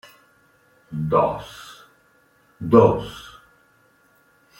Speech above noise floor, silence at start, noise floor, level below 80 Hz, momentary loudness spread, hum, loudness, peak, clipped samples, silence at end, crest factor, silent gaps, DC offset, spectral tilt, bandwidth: 40 dB; 0.9 s; -59 dBFS; -52 dBFS; 25 LU; none; -19 LUFS; -2 dBFS; under 0.1%; 1.3 s; 22 dB; none; under 0.1%; -8 dB/octave; 16 kHz